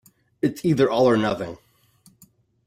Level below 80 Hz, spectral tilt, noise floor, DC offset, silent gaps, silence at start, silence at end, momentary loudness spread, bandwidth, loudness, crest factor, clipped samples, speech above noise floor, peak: -58 dBFS; -7 dB/octave; -58 dBFS; under 0.1%; none; 0.45 s; 1.1 s; 11 LU; 16 kHz; -21 LUFS; 18 dB; under 0.1%; 37 dB; -6 dBFS